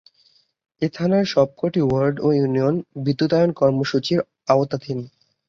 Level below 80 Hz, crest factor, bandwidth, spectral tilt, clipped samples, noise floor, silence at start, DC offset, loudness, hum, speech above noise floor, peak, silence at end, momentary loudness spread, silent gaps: -56 dBFS; 18 dB; 7.4 kHz; -7.5 dB/octave; under 0.1%; -60 dBFS; 0.8 s; under 0.1%; -20 LUFS; none; 41 dB; -2 dBFS; 0.4 s; 9 LU; none